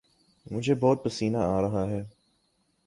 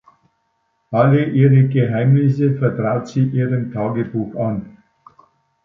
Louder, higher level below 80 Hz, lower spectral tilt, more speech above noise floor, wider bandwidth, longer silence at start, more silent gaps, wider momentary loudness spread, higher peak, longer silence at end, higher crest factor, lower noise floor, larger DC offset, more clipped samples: second, -28 LUFS vs -17 LUFS; about the same, -54 dBFS vs -56 dBFS; second, -7 dB/octave vs -10 dB/octave; second, 45 dB vs 51 dB; first, 11.5 kHz vs 6.2 kHz; second, 0.5 s vs 0.9 s; neither; about the same, 12 LU vs 10 LU; second, -10 dBFS vs -2 dBFS; second, 0.75 s vs 0.95 s; about the same, 18 dB vs 16 dB; first, -71 dBFS vs -67 dBFS; neither; neither